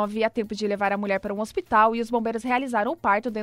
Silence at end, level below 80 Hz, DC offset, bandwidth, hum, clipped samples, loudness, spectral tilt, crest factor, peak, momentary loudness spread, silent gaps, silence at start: 0 s; -56 dBFS; under 0.1%; 15.5 kHz; none; under 0.1%; -24 LUFS; -5.5 dB/octave; 18 dB; -6 dBFS; 8 LU; none; 0 s